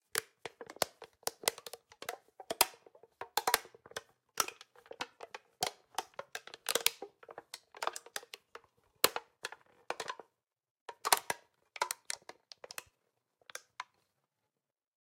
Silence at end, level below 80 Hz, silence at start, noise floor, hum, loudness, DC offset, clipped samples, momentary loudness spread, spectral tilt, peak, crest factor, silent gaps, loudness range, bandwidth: 1.2 s; -78 dBFS; 0.15 s; -90 dBFS; none; -37 LUFS; under 0.1%; under 0.1%; 20 LU; 0.5 dB/octave; -4 dBFS; 38 dB; 10.71-10.75 s, 10.81-10.86 s; 3 LU; 16.5 kHz